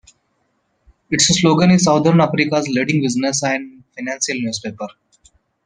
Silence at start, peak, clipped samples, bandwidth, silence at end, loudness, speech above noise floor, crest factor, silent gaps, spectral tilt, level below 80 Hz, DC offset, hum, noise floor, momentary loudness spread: 1.1 s; -2 dBFS; under 0.1%; 10 kHz; 0.8 s; -16 LUFS; 50 dB; 16 dB; none; -4.5 dB/octave; -52 dBFS; under 0.1%; none; -66 dBFS; 16 LU